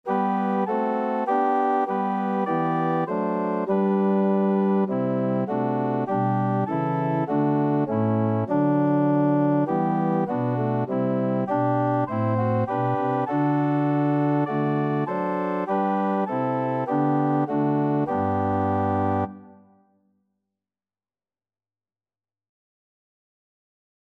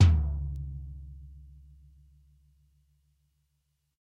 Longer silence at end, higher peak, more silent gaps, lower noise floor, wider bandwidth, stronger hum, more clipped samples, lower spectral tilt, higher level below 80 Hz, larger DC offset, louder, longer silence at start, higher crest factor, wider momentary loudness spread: first, 4.6 s vs 2.6 s; about the same, -10 dBFS vs -10 dBFS; neither; first, under -90 dBFS vs -77 dBFS; second, 5 kHz vs 7.2 kHz; neither; neither; first, -10.5 dB/octave vs -7 dB/octave; second, -68 dBFS vs -36 dBFS; neither; first, -23 LUFS vs -31 LUFS; about the same, 0.05 s vs 0 s; second, 14 dB vs 22 dB; second, 4 LU vs 26 LU